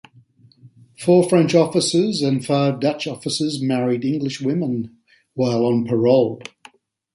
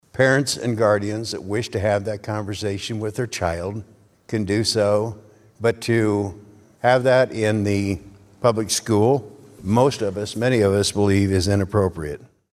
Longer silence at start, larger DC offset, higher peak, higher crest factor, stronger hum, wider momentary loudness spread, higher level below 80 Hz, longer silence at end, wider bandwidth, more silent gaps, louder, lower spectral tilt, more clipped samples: first, 0.65 s vs 0.15 s; neither; about the same, -2 dBFS vs -2 dBFS; about the same, 18 dB vs 18 dB; neither; about the same, 10 LU vs 10 LU; second, -62 dBFS vs -50 dBFS; first, 0.7 s vs 0.3 s; second, 11.5 kHz vs 14.5 kHz; neither; about the same, -19 LUFS vs -21 LUFS; about the same, -6 dB/octave vs -5 dB/octave; neither